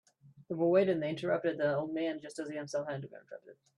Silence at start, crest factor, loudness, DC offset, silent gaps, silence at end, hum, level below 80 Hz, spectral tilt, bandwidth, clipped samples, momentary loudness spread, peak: 0.25 s; 18 dB; -33 LUFS; under 0.1%; none; 0.25 s; none; -78 dBFS; -6.5 dB/octave; 11 kHz; under 0.1%; 19 LU; -16 dBFS